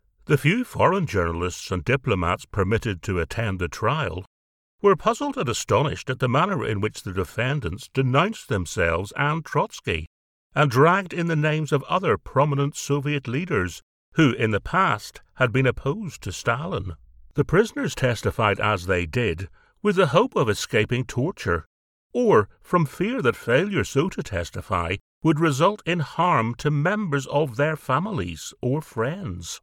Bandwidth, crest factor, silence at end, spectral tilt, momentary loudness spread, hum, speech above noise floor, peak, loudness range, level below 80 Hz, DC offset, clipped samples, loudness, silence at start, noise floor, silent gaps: 16.5 kHz; 20 dB; 0.05 s; -6 dB/octave; 9 LU; none; over 67 dB; -4 dBFS; 2 LU; -46 dBFS; under 0.1%; under 0.1%; -23 LUFS; 0.3 s; under -90 dBFS; 4.27-4.78 s, 10.07-10.50 s, 13.83-14.12 s, 21.66-22.10 s, 25.01-25.21 s